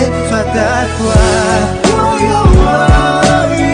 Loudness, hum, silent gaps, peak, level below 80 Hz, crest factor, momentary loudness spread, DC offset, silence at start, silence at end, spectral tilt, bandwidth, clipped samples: -10 LUFS; none; none; 0 dBFS; -16 dBFS; 10 dB; 5 LU; under 0.1%; 0 s; 0 s; -5.5 dB/octave; 10 kHz; under 0.1%